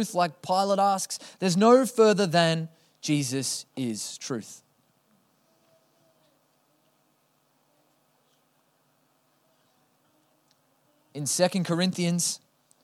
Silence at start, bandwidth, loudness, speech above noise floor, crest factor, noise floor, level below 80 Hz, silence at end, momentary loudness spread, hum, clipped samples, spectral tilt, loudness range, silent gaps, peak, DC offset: 0 s; 16 kHz; -25 LUFS; 44 dB; 22 dB; -69 dBFS; -80 dBFS; 0.45 s; 15 LU; none; under 0.1%; -4.5 dB/octave; 15 LU; none; -6 dBFS; under 0.1%